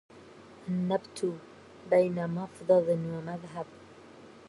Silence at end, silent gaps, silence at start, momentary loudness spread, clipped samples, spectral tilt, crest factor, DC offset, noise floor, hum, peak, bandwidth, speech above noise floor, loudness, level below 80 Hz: 0.1 s; none; 0.15 s; 18 LU; under 0.1%; -7.5 dB/octave; 18 dB; under 0.1%; -52 dBFS; none; -14 dBFS; 11.5 kHz; 23 dB; -30 LUFS; -70 dBFS